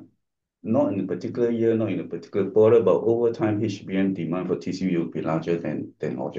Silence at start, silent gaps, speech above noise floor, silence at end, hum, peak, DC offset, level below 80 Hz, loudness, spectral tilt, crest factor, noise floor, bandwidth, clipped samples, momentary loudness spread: 0 s; none; 54 dB; 0 s; none; -8 dBFS; under 0.1%; -66 dBFS; -24 LUFS; -8 dB/octave; 16 dB; -77 dBFS; 7.4 kHz; under 0.1%; 11 LU